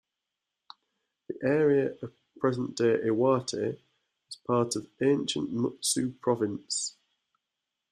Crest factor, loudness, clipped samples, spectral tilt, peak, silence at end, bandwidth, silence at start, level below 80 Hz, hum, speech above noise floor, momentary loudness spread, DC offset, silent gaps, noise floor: 18 dB; -28 LUFS; under 0.1%; -4.5 dB/octave; -12 dBFS; 1 s; 13.5 kHz; 1.3 s; -70 dBFS; none; 59 dB; 13 LU; under 0.1%; none; -86 dBFS